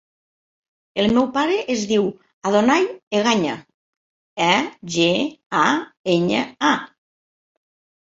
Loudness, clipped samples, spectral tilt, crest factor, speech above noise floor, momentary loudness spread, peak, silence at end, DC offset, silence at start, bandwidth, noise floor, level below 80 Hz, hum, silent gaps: -20 LUFS; under 0.1%; -4.5 dB/octave; 18 dB; over 71 dB; 8 LU; -2 dBFS; 1.25 s; under 0.1%; 0.95 s; 7.8 kHz; under -90 dBFS; -58 dBFS; none; 2.33-2.41 s, 3.03-3.11 s, 3.74-4.36 s, 5.46-5.50 s, 5.97-6.04 s